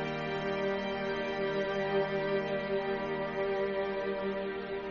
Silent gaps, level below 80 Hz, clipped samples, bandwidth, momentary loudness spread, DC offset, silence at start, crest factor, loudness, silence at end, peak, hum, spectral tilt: none; -60 dBFS; under 0.1%; 6.6 kHz; 3 LU; under 0.1%; 0 s; 14 dB; -33 LUFS; 0 s; -20 dBFS; none; -3.5 dB/octave